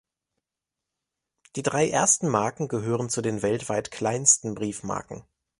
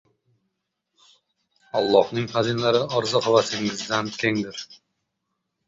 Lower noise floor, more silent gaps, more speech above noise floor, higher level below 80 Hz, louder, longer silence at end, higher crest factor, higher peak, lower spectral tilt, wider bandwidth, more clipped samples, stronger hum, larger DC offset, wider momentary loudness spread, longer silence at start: first, -87 dBFS vs -78 dBFS; neither; first, 62 dB vs 56 dB; about the same, -60 dBFS vs -64 dBFS; about the same, -24 LUFS vs -22 LUFS; second, 0.4 s vs 0.95 s; about the same, 22 dB vs 22 dB; about the same, -4 dBFS vs -4 dBFS; about the same, -3.5 dB/octave vs -4.5 dB/octave; first, 11.5 kHz vs 7.8 kHz; neither; neither; neither; first, 13 LU vs 9 LU; second, 1.55 s vs 1.75 s